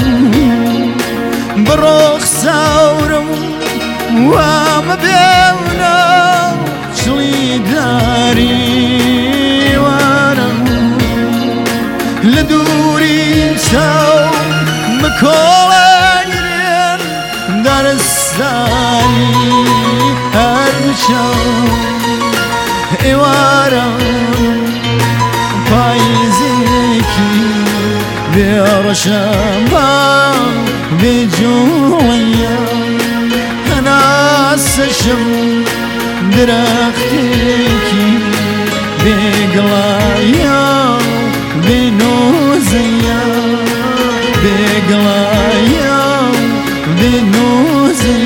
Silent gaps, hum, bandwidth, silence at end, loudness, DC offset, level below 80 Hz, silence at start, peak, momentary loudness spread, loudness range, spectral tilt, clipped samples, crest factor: none; none; 17 kHz; 0 s; -10 LUFS; under 0.1%; -28 dBFS; 0 s; 0 dBFS; 6 LU; 2 LU; -4.5 dB/octave; under 0.1%; 10 dB